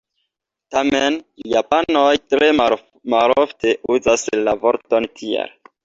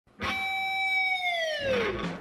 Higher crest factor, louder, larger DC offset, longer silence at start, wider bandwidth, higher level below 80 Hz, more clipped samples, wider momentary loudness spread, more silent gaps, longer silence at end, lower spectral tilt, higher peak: about the same, 16 dB vs 12 dB; first, -17 LUFS vs -27 LUFS; neither; first, 0.7 s vs 0.2 s; second, 8 kHz vs 13 kHz; about the same, -52 dBFS vs -54 dBFS; neither; first, 9 LU vs 5 LU; neither; first, 0.35 s vs 0 s; about the same, -3.5 dB/octave vs -3.5 dB/octave; first, -2 dBFS vs -16 dBFS